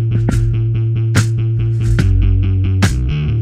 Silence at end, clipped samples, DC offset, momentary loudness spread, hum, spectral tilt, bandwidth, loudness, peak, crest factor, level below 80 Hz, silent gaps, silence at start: 0 s; under 0.1%; under 0.1%; 3 LU; none; -6.5 dB/octave; 12.5 kHz; -15 LUFS; -2 dBFS; 12 dB; -20 dBFS; none; 0 s